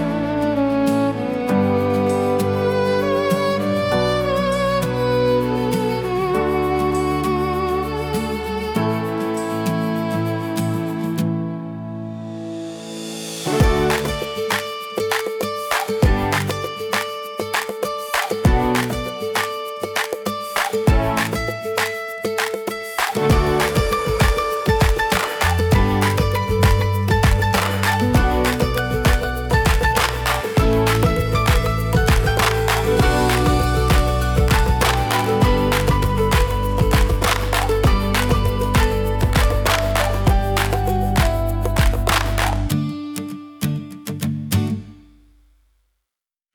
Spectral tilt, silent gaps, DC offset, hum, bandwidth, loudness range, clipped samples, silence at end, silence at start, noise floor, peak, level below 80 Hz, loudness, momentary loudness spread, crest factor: -5.5 dB/octave; none; under 0.1%; none; over 20 kHz; 5 LU; under 0.1%; 1.55 s; 0 s; -86 dBFS; -4 dBFS; -26 dBFS; -19 LUFS; 8 LU; 14 dB